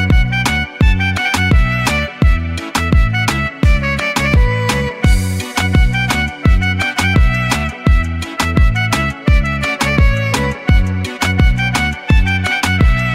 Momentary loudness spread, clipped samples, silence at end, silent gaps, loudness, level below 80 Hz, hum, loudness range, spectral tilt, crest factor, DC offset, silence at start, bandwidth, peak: 4 LU; under 0.1%; 0 s; none; -14 LUFS; -16 dBFS; none; 1 LU; -5 dB/octave; 12 dB; under 0.1%; 0 s; 15.5 kHz; 0 dBFS